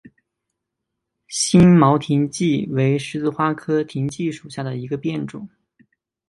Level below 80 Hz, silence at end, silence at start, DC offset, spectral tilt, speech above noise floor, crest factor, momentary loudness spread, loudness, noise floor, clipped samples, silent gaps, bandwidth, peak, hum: -50 dBFS; 0.85 s; 1.3 s; under 0.1%; -6 dB/octave; 62 dB; 20 dB; 16 LU; -19 LUFS; -80 dBFS; under 0.1%; none; 11.5 kHz; 0 dBFS; none